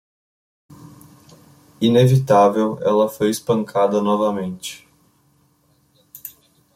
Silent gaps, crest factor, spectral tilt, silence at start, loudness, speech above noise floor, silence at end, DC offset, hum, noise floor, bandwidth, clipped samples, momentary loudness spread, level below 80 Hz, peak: none; 18 dB; -6.5 dB/octave; 1.8 s; -18 LUFS; 43 dB; 0.45 s; under 0.1%; none; -60 dBFS; 16.5 kHz; under 0.1%; 22 LU; -58 dBFS; -2 dBFS